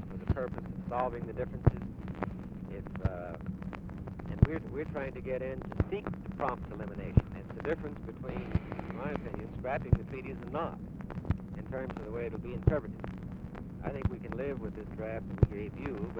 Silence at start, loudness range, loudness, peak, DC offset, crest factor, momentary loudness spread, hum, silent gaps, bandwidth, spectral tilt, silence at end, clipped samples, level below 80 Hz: 0 s; 2 LU; -36 LUFS; -8 dBFS; under 0.1%; 28 dB; 11 LU; none; none; 6 kHz; -10 dB/octave; 0 s; under 0.1%; -44 dBFS